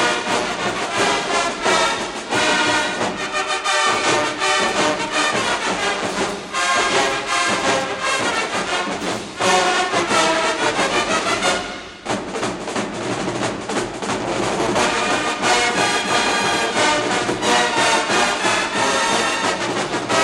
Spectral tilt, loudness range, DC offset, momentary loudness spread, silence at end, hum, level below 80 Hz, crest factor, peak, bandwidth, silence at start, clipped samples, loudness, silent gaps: -2 dB/octave; 4 LU; under 0.1%; 7 LU; 0 s; none; -50 dBFS; 16 dB; -4 dBFS; 16 kHz; 0 s; under 0.1%; -18 LUFS; none